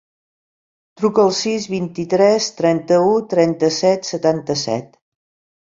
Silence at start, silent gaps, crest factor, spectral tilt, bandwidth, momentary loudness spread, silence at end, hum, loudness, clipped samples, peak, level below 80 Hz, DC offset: 1 s; none; 16 dB; -5 dB/octave; 7.8 kHz; 7 LU; 0.75 s; none; -17 LUFS; under 0.1%; -2 dBFS; -60 dBFS; under 0.1%